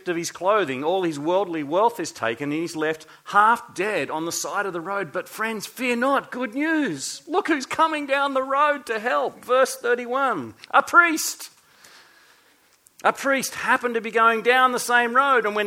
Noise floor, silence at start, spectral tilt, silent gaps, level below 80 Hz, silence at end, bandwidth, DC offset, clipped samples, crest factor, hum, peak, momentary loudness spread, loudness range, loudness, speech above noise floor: -59 dBFS; 0.05 s; -3 dB/octave; none; -72 dBFS; 0 s; 17 kHz; under 0.1%; under 0.1%; 20 dB; none; -2 dBFS; 10 LU; 4 LU; -22 LUFS; 36 dB